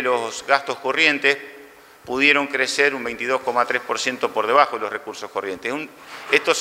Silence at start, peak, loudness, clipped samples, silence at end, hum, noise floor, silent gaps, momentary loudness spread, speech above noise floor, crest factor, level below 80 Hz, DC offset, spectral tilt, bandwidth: 0 s; 0 dBFS; -20 LUFS; under 0.1%; 0 s; none; -45 dBFS; none; 13 LU; 24 dB; 22 dB; -66 dBFS; under 0.1%; -2 dB/octave; 16 kHz